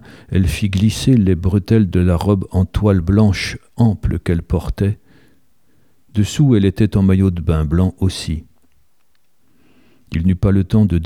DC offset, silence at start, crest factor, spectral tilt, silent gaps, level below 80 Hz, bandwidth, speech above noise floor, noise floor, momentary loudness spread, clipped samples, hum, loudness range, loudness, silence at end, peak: 0.3%; 0.15 s; 14 dB; -7.5 dB/octave; none; -30 dBFS; 14 kHz; 51 dB; -65 dBFS; 8 LU; under 0.1%; none; 5 LU; -16 LUFS; 0 s; -2 dBFS